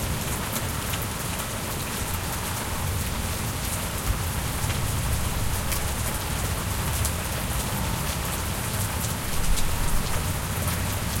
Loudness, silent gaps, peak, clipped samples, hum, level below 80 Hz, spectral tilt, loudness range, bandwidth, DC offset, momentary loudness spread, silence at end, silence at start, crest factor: -27 LUFS; none; -10 dBFS; under 0.1%; none; -32 dBFS; -3.5 dB/octave; 1 LU; 17 kHz; under 0.1%; 2 LU; 0 s; 0 s; 16 dB